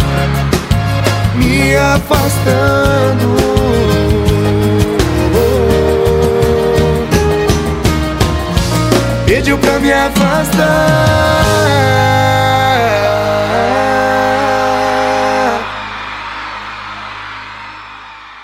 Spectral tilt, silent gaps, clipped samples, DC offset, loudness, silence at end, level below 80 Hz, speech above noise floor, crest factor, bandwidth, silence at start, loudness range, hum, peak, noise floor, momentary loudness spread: -5.5 dB/octave; none; under 0.1%; under 0.1%; -12 LUFS; 0 s; -24 dBFS; 21 dB; 12 dB; 16.5 kHz; 0 s; 4 LU; none; 0 dBFS; -32 dBFS; 12 LU